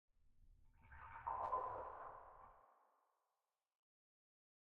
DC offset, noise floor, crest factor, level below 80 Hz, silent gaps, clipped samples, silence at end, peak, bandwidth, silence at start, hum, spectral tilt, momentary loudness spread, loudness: under 0.1%; under -90 dBFS; 22 dB; -72 dBFS; none; under 0.1%; 1.9 s; -30 dBFS; 4.3 kHz; 0.25 s; none; -4.5 dB/octave; 21 LU; -48 LUFS